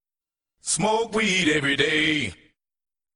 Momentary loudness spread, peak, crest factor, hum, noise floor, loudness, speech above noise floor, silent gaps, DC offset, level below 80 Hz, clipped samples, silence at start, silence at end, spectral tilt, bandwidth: 7 LU; -6 dBFS; 20 dB; none; under -90 dBFS; -22 LUFS; over 68 dB; none; under 0.1%; -56 dBFS; under 0.1%; 0.65 s; 0.8 s; -3 dB/octave; 11 kHz